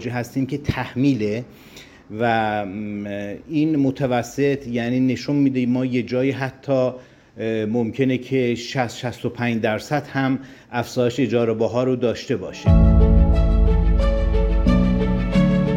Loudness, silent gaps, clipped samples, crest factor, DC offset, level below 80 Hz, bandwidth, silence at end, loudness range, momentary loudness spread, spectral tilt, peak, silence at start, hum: -21 LUFS; none; under 0.1%; 16 dB; under 0.1%; -24 dBFS; 9.4 kHz; 0 s; 5 LU; 9 LU; -7.5 dB/octave; -4 dBFS; 0 s; none